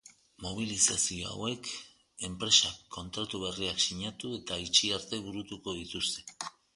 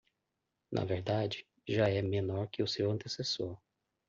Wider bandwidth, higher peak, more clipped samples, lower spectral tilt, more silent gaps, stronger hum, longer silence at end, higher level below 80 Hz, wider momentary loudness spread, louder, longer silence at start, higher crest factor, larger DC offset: first, 11.5 kHz vs 7.6 kHz; first, -8 dBFS vs -18 dBFS; neither; second, -1.5 dB/octave vs -6 dB/octave; neither; neither; second, 0.25 s vs 0.5 s; first, -58 dBFS vs -68 dBFS; first, 16 LU vs 9 LU; first, -30 LUFS vs -35 LUFS; second, 0.05 s vs 0.7 s; first, 26 dB vs 18 dB; neither